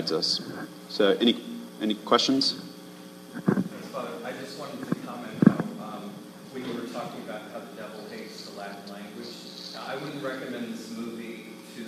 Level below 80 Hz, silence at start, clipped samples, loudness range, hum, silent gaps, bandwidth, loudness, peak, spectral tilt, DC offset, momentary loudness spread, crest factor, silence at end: -74 dBFS; 0 s; under 0.1%; 12 LU; none; none; 14.5 kHz; -29 LUFS; -2 dBFS; -5 dB/octave; under 0.1%; 18 LU; 28 dB; 0 s